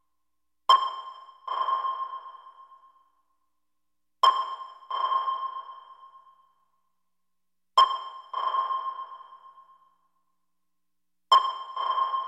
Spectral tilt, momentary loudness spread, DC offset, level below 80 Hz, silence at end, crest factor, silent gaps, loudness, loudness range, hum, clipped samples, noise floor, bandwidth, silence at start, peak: 1.5 dB/octave; 20 LU; under 0.1%; -84 dBFS; 0 s; 24 dB; none; -26 LUFS; 5 LU; none; under 0.1%; -87 dBFS; 11.5 kHz; 0.7 s; -6 dBFS